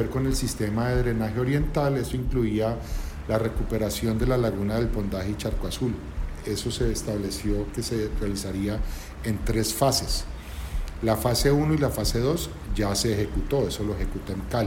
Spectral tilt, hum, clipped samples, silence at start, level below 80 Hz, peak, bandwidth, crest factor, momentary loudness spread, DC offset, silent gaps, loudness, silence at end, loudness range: -5.5 dB/octave; none; under 0.1%; 0 s; -32 dBFS; -8 dBFS; 16.5 kHz; 18 dB; 9 LU; under 0.1%; none; -27 LUFS; 0 s; 4 LU